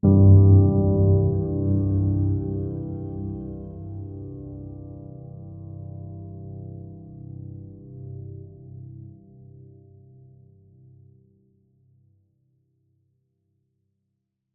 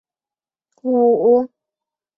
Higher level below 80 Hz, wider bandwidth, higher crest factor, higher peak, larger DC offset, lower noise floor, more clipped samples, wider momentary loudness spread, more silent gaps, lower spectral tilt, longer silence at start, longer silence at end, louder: first, -46 dBFS vs -66 dBFS; second, 1.3 kHz vs 1.6 kHz; about the same, 20 dB vs 16 dB; about the same, -4 dBFS vs -4 dBFS; neither; second, -78 dBFS vs under -90 dBFS; neither; first, 25 LU vs 15 LU; neither; first, -17.5 dB/octave vs -11 dB/octave; second, 0.05 s vs 0.85 s; first, 5.55 s vs 0.7 s; second, -20 LUFS vs -16 LUFS